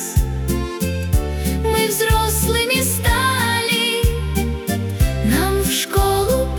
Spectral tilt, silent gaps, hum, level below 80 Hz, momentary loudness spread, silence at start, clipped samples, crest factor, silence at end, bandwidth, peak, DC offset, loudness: -4 dB/octave; none; none; -24 dBFS; 6 LU; 0 s; under 0.1%; 14 dB; 0 s; over 20 kHz; -4 dBFS; under 0.1%; -18 LUFS